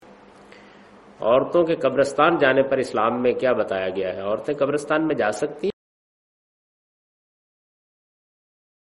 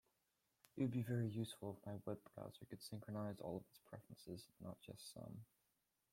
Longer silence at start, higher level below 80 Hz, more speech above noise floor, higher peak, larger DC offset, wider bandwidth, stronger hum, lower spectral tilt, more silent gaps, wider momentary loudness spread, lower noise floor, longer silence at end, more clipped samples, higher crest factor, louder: first, 1.2 s vs 0.75 s; first, -60 dBFS vs -80 dBFS; second, 27 dB vs 38 dB; first, -2 dBFS vs -30 dBFS; neither; second, 11.5 kHz vs 16.5 kHz; neither; second, -5.5 dB/octave vs -7 dB/octave; neither; second, 8 LU vs 16 LU; second, -48 dBFS vs -87 dBFS; first, 3.1 s vs 0.7 s; neither; about the same, 20 dB vs 20 dB; first, -21 LUFS vs -50 LUFS